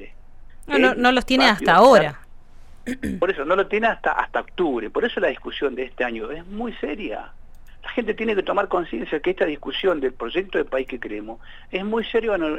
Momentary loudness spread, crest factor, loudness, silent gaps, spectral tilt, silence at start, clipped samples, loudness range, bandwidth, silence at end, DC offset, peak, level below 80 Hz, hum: 15 LU; 18 dB; -21 LUFS; none; -5 dB/octave; 0 s; under 0.1%; 9 LU; 13.5 kHz; 0 s; under 0.1%; -4 dBFS; -42 dBFS; none